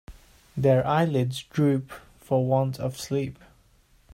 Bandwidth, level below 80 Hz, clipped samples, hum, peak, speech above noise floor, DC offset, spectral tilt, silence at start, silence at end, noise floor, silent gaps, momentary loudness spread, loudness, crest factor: 15.5 kHz; -56 dBFS; under 0.1%; none; -10 dBFS; 36 dB; under 0.1%; -7 dB/octave; 0.1 s; 0.8 s; -60 dBFS; none; 14 LU; -25 LUFS; 16 dB